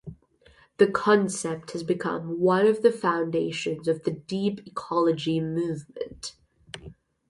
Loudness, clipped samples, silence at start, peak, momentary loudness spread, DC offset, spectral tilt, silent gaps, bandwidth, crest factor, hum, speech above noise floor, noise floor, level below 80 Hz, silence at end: -26 LUFS; under 0.1%; 0.05 s; -6 dBFS; 18 LU; under 0.1%; -5.5 dB/octave; none; 11.5 kHz; 20 dB; none; 33 dB; -58 dBFS; -60 dBFS; 0.35 s